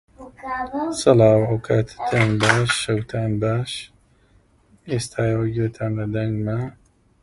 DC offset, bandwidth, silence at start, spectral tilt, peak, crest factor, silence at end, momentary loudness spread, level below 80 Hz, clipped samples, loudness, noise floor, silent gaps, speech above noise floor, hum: under 0.1%; 11.5 kHz; 0.2 s; -5.5 dB/octave; 0 dBFS; 20 dB; 0.5 s; 13 LU; -48 dBFS; under 0.1%; -21 LUFS; -57 dBFS; none; 37 dB; none